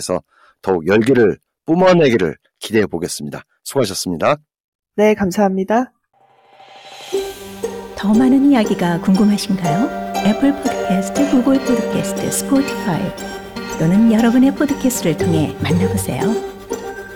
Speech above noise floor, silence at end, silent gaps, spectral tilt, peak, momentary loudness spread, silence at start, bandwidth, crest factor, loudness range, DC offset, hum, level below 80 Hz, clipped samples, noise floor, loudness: 32 dB; 0 s; 4.60-4.79 s; -5.5 dB/octave; -2 dBFS; 15 LU; 0 s; 18.5 kHz; 14 dB; 4 LU; under 0.1%; none; -46 dBFS; under 0.1%; -47 dBFS; -16 LUFS